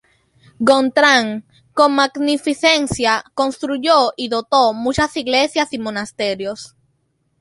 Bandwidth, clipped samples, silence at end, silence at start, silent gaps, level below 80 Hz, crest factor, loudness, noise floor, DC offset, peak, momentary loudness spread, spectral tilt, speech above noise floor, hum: 11.5 kHz; under 0.1%; 0.75 s; 0.6 s; none; -48 dBFS; 16 dB; -16 LUFS; -66 dBFS; under 0.1%; 0 dBFS; 12 LU; -3.5 dB/octave; 49 dB; none